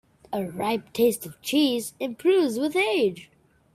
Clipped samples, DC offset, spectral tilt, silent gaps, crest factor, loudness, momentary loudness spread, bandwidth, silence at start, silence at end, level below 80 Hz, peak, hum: under 0.1%; under 0.1%; -4 dB/octave; none; 16 dB; -25 LUFS; 10 LU; 16 kHz; 0.3 s; 0.5 s; -66 dBFS; -10 dBFS; none